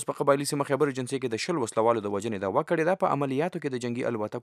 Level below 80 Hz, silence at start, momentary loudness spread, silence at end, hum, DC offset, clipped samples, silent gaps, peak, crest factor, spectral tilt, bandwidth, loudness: -78 dBFS; 0 s; 6 LU; 0 s; none; under 0.1%; under 0.1%; none; -8 dBFS; 20 dB; -5.5 dB/octave; 15 kHz; -27 LUFS